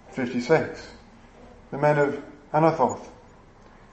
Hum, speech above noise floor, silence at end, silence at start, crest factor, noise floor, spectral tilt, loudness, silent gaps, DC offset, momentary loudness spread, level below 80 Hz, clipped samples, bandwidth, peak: none; 27 dB; 0.8 s; 0.1 s; 22 dB; -51 dBFS; -6.5 dB/octave; -24 LUFS; none; under 0.1%; 16 LU; -56 dBFS; under 0.1%; 8.6 kHz; -4 dBFS